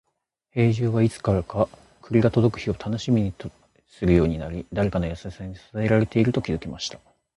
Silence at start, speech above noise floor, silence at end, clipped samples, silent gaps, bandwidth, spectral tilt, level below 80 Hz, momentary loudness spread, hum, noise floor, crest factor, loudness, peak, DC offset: 0.55 s; 51 dB; 0.4 s; under 0.1%; none; 11 kHz; -7.5 dB/octave; -40 dBFS; 12 LU; none; -74 dBFS; 18 dB; -24 LUFS; -6 dBFS; under 0.1%